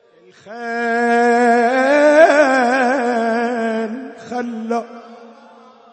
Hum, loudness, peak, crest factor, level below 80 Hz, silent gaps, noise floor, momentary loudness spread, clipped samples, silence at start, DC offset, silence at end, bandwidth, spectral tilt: none; -15 LUFS; 0 dBFS; 16 dB; -68 dBFS; none; -44 dBFS; 16 LU; under 0.1%; 0.45 s; under 0.1%; 0.65 s; 8.8 kHz; -4 dB/octave